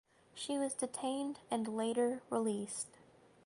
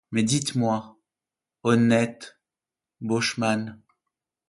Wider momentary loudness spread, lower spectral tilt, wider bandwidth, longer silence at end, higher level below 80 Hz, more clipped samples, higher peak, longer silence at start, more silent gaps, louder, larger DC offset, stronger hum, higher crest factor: second, 9 LU vs 17 LU; about the same, -4 dB/octave vs -5 dB/octave; about the same, 11.5 kHz vs 11.5 kHz; second, 0.55 s vs 0.75 s; second, -80 dBFS vs -64 dBFS; neither; second, -22 dBFS vs -8 dBFS; first, 0.35 s vs 0.1 s; neither; second, -38 LUFS vs -24 LUFS; neither; neither; about the same, 16 dB vs 20 dB